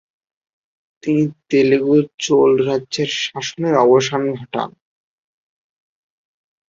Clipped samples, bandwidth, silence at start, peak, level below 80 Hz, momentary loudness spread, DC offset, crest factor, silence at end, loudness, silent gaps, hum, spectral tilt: under 0.1%; 7.6 kHz; 1.05 s; -2 dBFS; -62 dBFS; 11 LU; under 0.1%; 16 dB; 2 s; -17 LUFS; 2.14-2.18 s; none; -5 dB/octave